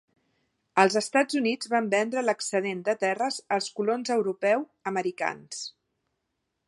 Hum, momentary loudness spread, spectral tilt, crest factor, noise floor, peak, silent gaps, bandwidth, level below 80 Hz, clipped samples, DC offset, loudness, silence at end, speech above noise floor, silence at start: none; 9 LU; -3.5 dB/octave; 24 dB; -80 dBFS; -4 dBFS; none; 11.5 kHz; -80 dBFS; under 0.1%; under 0.1%; -27 LUFS; 0.95 s; 54 dB; 0.75 s